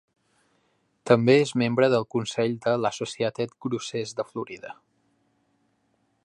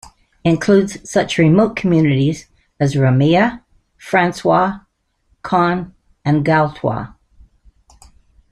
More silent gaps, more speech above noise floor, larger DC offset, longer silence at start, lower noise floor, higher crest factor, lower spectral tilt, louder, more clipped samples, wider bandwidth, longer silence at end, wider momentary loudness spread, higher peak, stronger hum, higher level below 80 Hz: neither; about the same, 46 dB vs 47 dB; neither; first, 1.05 s vs 0.45 s; first, -70 dBFS vs -61 dBFS; first, 22 dB vs 16 dB; second, -5.5 dB/octave vs -7 dB/octave; second, -25 LUFS vs -16 LUFS; neither; about the same, 11 kHz vs 12 kHz; about the same, 1.55 s vs 1.45 s; about the same, 15 LU vs 13 LU; second, -4 dBFS vs 0 dBFS; neither; second, -68 dBFS vs -46 dBFS